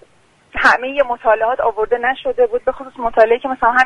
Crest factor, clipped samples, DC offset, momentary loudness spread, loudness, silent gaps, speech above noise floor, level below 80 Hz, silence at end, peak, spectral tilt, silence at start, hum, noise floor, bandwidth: 16 dB; under 0.1%; under 0.1%; 7 LU; -16 LUFS; none; 37 dB; -44 dBFS; 0 s; 0 dBFS; -3.5 dB/octave; 0.55 s; none; -53 dBFS; 10.5 kHz